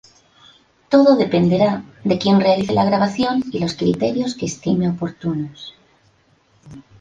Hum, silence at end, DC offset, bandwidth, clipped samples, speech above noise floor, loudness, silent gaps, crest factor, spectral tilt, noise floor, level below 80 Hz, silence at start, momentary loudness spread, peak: none; 0.2 s; under 0.1%; 9.2 kHz; under 0.1%; 40 dB; -18 LUFS; none; 16 dB; -6.5 dB/octave; -57 dBFS; -52 dBFS; 0.9 s; 10 LU; -2 dBFS